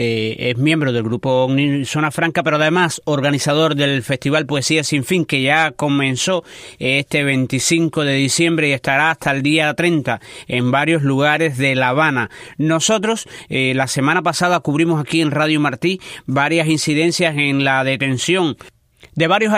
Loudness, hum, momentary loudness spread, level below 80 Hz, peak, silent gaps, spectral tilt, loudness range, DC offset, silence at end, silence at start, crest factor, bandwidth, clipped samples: -16 LUFS; none; 5 LU; -56 dBFS; -2 dBFS; none; -4.5 dB/octave; 1 LU; under 0.1%; 0 s; 0 s; 16 dB; 15.5 kHz; under 0.1%